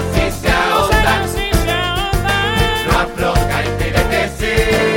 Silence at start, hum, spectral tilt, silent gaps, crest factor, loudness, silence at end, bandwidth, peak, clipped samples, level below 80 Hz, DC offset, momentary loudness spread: 0 s; none; -4.5 dB/octave; none; 14 dB; -15 LUFS; 0 s; 17 kHz; 0 dBFS; under 0.1%; -22 dBFS; under 0.1%; 4 LU